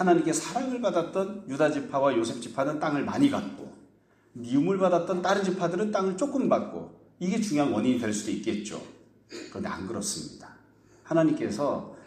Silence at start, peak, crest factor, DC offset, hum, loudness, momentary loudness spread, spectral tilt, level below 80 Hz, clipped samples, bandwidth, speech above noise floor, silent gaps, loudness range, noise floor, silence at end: 0 s; -10 dBFS; 18 dB; under 0.1%; none; -28 LUFS; 14 LU; -5.5 dB/octave; -66 dBFS; under 0.1%; 15 kHz; 34 dB; none; 5 LU; -61 dBFS; 0 s